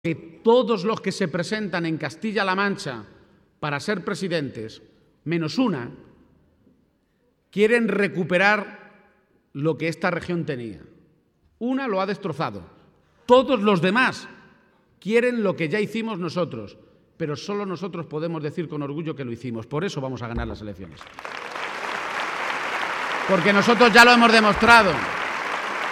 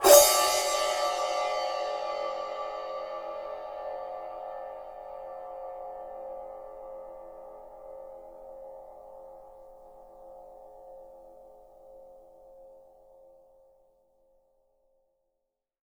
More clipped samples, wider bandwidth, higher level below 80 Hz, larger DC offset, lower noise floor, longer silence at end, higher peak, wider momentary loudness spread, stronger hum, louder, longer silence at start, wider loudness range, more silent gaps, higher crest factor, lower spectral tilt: neither; second, 16 kHz vs over 20 kHz; first, -50 dBFS vs -62 dBFS; neither; second, -66 dBFS vs -84 dBFS; second, 0 s vs 3.05 s; first, 0 dBFS vs -4 dBFS; second, 18 LU vs 24 LU; neither; first, -22 LUFS vs -29 LUFS; about the same, 0.05 s vs 0 s; second, 13 LU vs 22 LU; neither; about the same, 24 dB vs 28 dB; first, -5 dB/octave vs 0 dB/octave